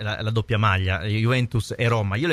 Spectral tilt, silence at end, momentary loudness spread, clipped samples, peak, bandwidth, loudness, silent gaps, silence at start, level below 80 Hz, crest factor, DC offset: -6.5 dB/octave; 0 s; 4 LU; under 0.1%; -8 dBFS; 12.5 kHz; -23 LUFS; none; 0 s; -46 dBFS; 14 dB; under 0.1%